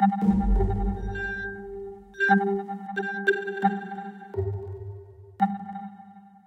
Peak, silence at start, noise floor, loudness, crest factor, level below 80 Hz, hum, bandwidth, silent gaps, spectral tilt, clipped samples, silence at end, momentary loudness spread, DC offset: -8 dBFS; 0 s; -49 dBFS; -27 LUFS; 18 dB; -34 dBFS; none; 8 kHz; none; -8 dB/octave; under 0.1%; 0.2 s; 17 LU; under 0.1%